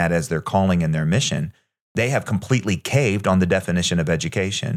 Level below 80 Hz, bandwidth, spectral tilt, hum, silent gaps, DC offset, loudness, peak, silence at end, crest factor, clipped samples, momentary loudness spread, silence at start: -50 dBFS; 14.5 kHz; -5.5 dB/octave; none; 1.81-1.95 s; under 0.1%; -21 LUFS; -4 dBFS; 0 s; 16 dB; under 0.1%; 4 LU; 0 s